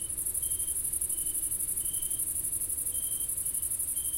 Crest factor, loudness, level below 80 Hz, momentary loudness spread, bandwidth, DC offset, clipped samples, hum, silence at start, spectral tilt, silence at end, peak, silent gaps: 16 dB; -29 LUFS; -52 dBFS; 1 LU; 16.5 kHz; under 0.1%; under 0.1%; none; 0 s; -0.5 dB/octave; 0 s; -16 dBFS; none